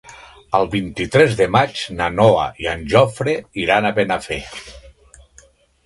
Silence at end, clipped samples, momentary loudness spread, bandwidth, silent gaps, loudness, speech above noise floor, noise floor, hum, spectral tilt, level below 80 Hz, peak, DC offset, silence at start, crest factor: 0.95 s; under 0.1%; 10 LU; 11.5 kHz; none; -17 LUFS; 34 dB; -51 dBFS; none; -5.5 dB/octave; -42 dBFS; 0 dBFS; under 0.1%; 0.05 s; 18 dB